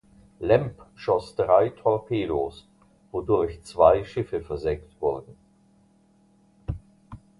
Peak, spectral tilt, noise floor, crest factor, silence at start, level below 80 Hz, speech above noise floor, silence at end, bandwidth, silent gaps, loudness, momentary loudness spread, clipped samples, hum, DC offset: -4 dBFS; -7.5 dB/octave; -60 dBFS; 22 dB; 0.4 s; -46 dBFS; 37 dB; 0.25 s; 11.5 kHz; none; -25 LUFS; 16 LU; under 0.1%; none; under 0.1%